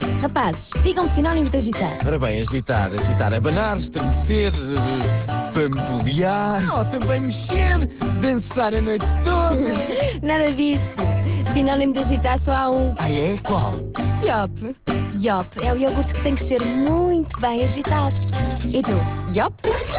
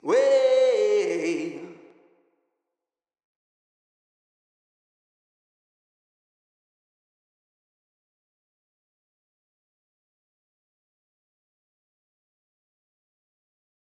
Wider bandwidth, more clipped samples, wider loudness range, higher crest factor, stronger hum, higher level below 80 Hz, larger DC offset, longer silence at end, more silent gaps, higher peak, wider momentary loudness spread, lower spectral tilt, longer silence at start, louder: second, 4 kHz vs 9 kHz; neither; second, 2 LU vs 17 LU; second, 12 dB vs 20 dB; neither; first, -28 dBFS vs under -90 dBFS; neither; second, 0 s vs 12.25 s; neither; about the same, -8 dBFS vs -10 dBFS; second, 4 LU vs 14 LU; first, -11.5 dB/octave vs -4 dB/octave; about the same, 0 s vs 0.05 s; about the same, -21 LUFS vs -22 LUFS